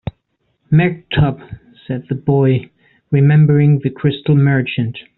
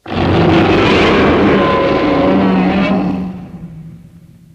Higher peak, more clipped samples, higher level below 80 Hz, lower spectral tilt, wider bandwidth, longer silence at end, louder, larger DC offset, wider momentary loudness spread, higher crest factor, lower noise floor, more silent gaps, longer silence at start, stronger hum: about the same, -2 dBFS vs 0 dBFS; neither; second, -42 dBFS vs -32 dBFS; about the same, -7.5 dB/octave vs -7 dB/octave; second, 4.1 kHz vs 8.6 kHz; second, 0.15 s vs 0.6 s; second, -15 LUFS vs -11 LUFS; neither; about the same, 15 LU vs 17 LU; about the same, 12 dB vs 12 dB; first, -66 dBFS vs -39 dBFS; neither; about the same, 0.05 s vs 0.05 s; neither